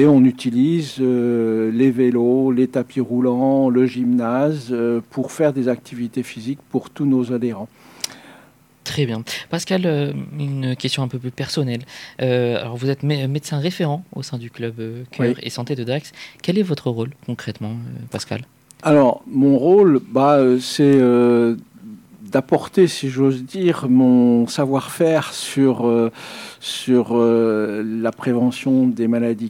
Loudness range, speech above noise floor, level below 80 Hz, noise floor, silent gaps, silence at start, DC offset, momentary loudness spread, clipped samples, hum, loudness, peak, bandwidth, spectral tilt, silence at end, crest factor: 8 LU; 32 dB; -64 dBFS; -50 dBFS; none; 0 s; under 0.1%; 14 LU; under 0.1%; none; -19 LUFS; -4 dBFS; 15.5 kHz; -6.5 dB/octave; 0 s; 14 dB